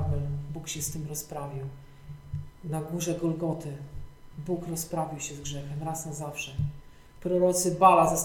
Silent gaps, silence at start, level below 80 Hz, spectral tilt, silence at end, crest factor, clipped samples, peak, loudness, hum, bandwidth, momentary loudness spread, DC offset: none; 0 s; -48 dBFS; -5 dB/octave; 0 s; 24 dB; under 0.1%; -6 dBFS; -29 LUFS; none; 18.5 kHz; 19 LU; under 0.1%